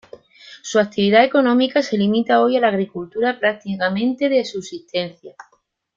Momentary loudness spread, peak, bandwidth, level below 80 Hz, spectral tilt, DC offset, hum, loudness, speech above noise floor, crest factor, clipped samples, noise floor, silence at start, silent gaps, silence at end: 11 LU; -2 dBFS; 7.6 kHz; -64 dBFS; -5.5 dB/octave; under 0.1%; none; -18 LUFS; 26 dB; 18 dB; under 0.1%; -44 dBFS; 0.45 s; none; 0.65 s